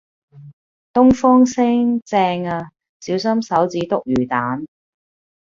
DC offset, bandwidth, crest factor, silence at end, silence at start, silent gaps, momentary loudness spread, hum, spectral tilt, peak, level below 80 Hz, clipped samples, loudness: under 0.1%; 7.4 kHz; 16 dB; 0.95 s; 0.35 s; 0.53-0.94 s, 2.02-2.06 s, 2.89-3.00 s; 14 LU; none; -6 dB/octave; -2 dBFS; -48 dBFS; under 0.1%; -17 LUFS